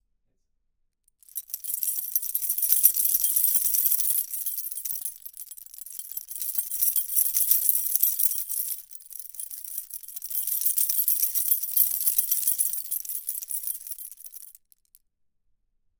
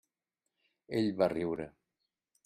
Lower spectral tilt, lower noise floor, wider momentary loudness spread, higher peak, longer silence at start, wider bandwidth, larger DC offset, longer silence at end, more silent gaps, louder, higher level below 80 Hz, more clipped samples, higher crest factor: second, 4.5 dB/octave vs -7.5 dB/octave; second, -73 dBFS vs -88 dBFS; first, 18 LU vs 11 LU; first, 0 dBFS vs -14 dBFS; first, 1.35 s vs 0.9 s; first, over 20 kHz vs 13 kHz; neither; first, 1.5 s vs 0.75 s; neither; first, -23 LUFS vs -34 LUFS; about the same, -70 dBFS vs -68 dBFS; neither; first, 28 dB vs 22 dB